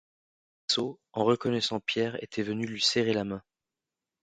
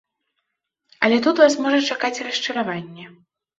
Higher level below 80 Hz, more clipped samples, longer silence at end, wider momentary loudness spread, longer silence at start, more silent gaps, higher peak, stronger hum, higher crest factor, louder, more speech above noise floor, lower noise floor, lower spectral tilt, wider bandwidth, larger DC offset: about the same, -68 dBFS vs -70 dBFS; neither; first, 0.8 s vs 0.5 s; second, 9 LU vs 12 LU; second, 0.7 s vs 1 s; neither; second, -10 dBFS vs -2 dBFS; neither; about the same, 20 dB vs 20 dB; second, -29 LUFS vs -19 LUFS; about the same, 60 dB vs 58 dB; first, -90 dBFS vs -78 dBFS; about the same, -4 dB/octave vs -3.5 dB/octave; first, 9.4 kHz vs 8 kHz; neither